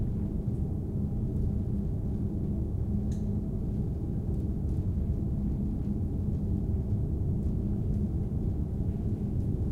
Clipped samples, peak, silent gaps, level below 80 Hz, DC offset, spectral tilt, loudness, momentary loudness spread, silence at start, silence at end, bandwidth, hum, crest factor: under 0.1%; -18 dBFS; none; -36 dBFS; under 0.1%; -11 dB/octave; -32 LUFS; 2 LU; 0 s; 0 s; 6.8 kHz; none; 12 dB